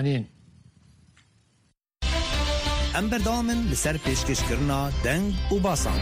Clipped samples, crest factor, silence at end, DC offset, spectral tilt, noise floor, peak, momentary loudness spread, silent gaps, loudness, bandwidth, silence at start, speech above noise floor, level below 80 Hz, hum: under 0.1%; 14 dB; 0 s; under 0.1%; -4.5 dB/octave; -67 dBFS; -12 dBFS; 3 LU; none; -26 LUFS; 15.5 kHz; 0 s; 43 dB; -32 dBFS; none